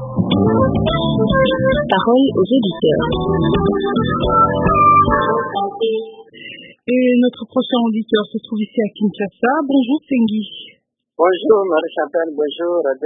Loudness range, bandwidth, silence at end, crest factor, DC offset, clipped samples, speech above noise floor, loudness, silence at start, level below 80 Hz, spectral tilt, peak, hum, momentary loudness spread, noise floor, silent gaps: 4 LU; 3.9 kHz; 0 s; 16 dB; under 0.1%; under 0.1%; 21 dB; -16 LUFS; 0 s; -36 dBFS; -10.5 dB/octave; 0 dBFS; none; 8 LU; -36 dBFS; none